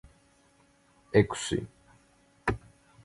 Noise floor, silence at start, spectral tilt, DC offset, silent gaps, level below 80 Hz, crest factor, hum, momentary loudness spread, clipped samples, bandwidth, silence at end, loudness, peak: -64 dBFS; 1.15 s; -5.5 dB/octave; under 0.1%; none; -50 dBFS; 26 dB; none; 13 LU; under 0.1%; 11.5 kHz; 0.45 s; -30 LUFS; -6 dBFS